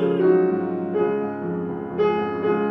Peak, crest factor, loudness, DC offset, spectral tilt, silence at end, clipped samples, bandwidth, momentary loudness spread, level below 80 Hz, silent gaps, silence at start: -6 dBFS; 16 dB; -22 LUFS; under 0.1%; -10 dB/octave; 0 s; under 0.1%; 5.6 kHz; 9 LU; -62 dBFS; none; 0 s